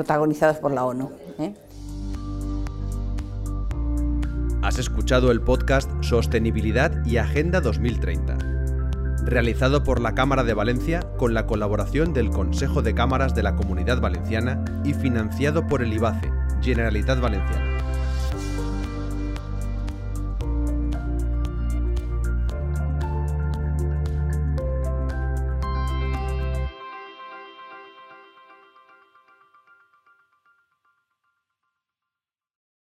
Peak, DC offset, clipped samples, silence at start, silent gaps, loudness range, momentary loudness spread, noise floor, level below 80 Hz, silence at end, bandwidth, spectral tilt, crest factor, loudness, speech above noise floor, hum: -6 dBFS; under 0.1%; under 0.1%; 0 s; none; 7 LU; 10 LU; -89 dBFS; -28 dBFS; 4.7 s; 13 kHz; -7 dB/octave; 18 dB; -24 LUFS; 68 dB; none